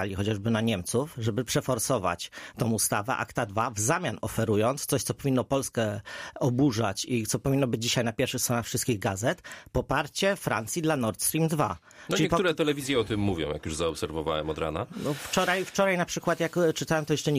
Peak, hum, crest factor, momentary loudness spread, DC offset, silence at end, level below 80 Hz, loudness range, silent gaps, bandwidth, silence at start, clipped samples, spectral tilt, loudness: -10 dBFS; none; 16 dB; 6 LU; under 0.1%; 0 s; -52 dBFS; 1 LU; none; 15.5 kHz; 0 s; under 0.1%; -4.5 dB/octave; -28 LUFS